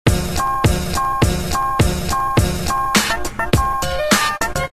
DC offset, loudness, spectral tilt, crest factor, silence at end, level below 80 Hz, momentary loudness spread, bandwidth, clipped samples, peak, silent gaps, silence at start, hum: 2%; -18 LUFS; -4 dB/octave; 18 dB; 0 s; -26 dBFS; 4 LU; 15 kHz; under 0.1%; 0 dBFS; none; 0.05 s; none